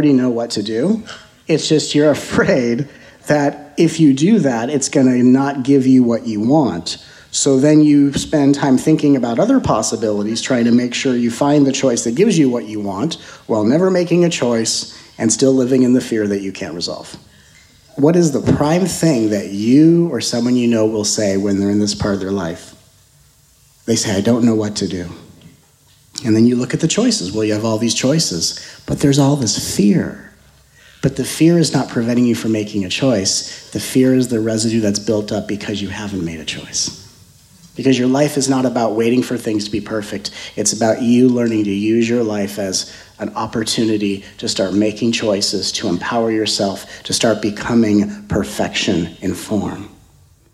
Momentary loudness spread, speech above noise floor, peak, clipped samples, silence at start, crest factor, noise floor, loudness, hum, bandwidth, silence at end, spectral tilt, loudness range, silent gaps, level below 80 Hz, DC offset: 10 LU; 36 dB; 0 dBFS; under 0.1%; 0 s; 16 dB; -51 dBFS; -16 LUFS; none; 15 kHz; 0.65 s; -5 dB/octave; 5 LU; none; -48 dBFS; under 0.1%